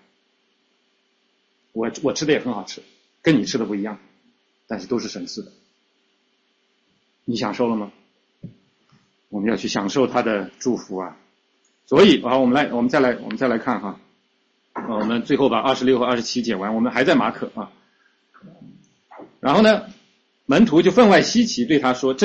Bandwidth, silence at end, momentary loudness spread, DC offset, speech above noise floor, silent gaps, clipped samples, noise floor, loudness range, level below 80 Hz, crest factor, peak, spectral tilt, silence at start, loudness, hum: 8.2 kHz; 0 s; 19 LU; under 0.1%; 47 dB; none; under 0.1%; -66 dBFS; 11 LU; -58 dBFS; 20 dB; -2 dBFS; -5 dB/octave; 1.75 s; -19 LUFS; none